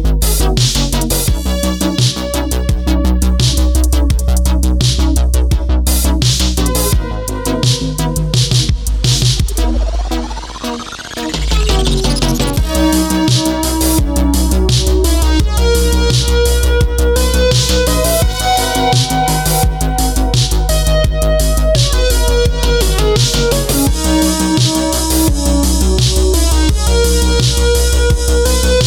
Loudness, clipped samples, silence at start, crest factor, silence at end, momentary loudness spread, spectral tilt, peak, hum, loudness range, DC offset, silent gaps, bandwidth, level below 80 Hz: -13 LUFS; under 0.1%; 0 s; 10 dB; 0 s; 4 LU; -4.5 dB/octave; -2 dBFS; none; 3 LU; under 0.1%; none; 18 kHz; -14 dBFS